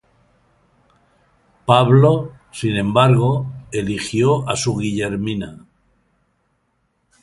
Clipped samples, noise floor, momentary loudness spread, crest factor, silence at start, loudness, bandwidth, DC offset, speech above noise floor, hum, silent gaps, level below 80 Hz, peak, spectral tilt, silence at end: under 0.1%; -67 dBFS; 13 LU; 18 dB; 1.65 s; -17 LUFS; 11.5 kHz; under 0.1%; 50 dB; none; none; -48 dBFS; 0 dBFS; -6 dB/octave; 1.65 s